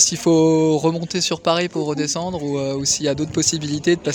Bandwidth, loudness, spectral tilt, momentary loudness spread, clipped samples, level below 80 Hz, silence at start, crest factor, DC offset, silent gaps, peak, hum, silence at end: 17 kHz; -19 LUFS; -4 dB/octave; 8 LU; under 0.1%; -52 dBFS; 0 s; 18 dB; under 0.1%; none; -2 dBFS; none; 0 s